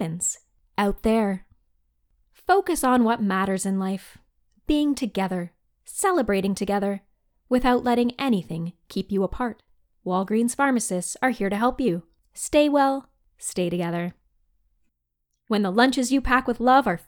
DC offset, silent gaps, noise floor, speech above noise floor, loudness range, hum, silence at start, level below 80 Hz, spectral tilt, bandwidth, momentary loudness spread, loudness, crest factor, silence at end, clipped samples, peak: under 0.1%; none; -77 dBFS; 54 dB; 3 LU; none; 0 s; -44 dBFS; -4.5 dB/octave; 19.5 kHz; 13 LU; -24 LUFS; 18 dB; 0.1 s; under 0.1%; -6 dBFS